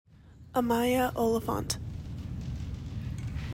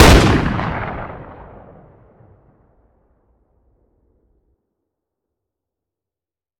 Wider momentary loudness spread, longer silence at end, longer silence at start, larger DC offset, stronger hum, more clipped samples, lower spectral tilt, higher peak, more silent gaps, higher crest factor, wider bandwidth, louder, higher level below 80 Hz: second, 12 LU vs 28 LU; second, 0 s vs 5.15 s; about the same, 0.1 s vs 0 s; neither; neither; neither; about the same, -5.5 dB/octave vs -5 dB/octave; second, -14 dBFS vs 0 dBFS; neither; about the same, 16 dB vs 20 dB; about the same, 16 kHz vs 16.5 kHz; second, -32 LUFS vs -16 LUFS; second, -44 dBFS vs -26 dBFS